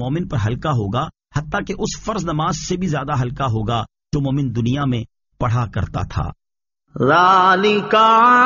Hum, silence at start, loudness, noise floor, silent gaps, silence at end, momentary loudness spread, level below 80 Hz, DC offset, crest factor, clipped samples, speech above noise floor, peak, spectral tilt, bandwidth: none; 0 s; -18 LUFS; -74 dBFS; none; 0 s; 13 LU; -38 dBFS; under 0.1%; 16 dB; under 0.1%; 57 dB; -2 dBFS; -4.5 dB/octave; 7.2 kHz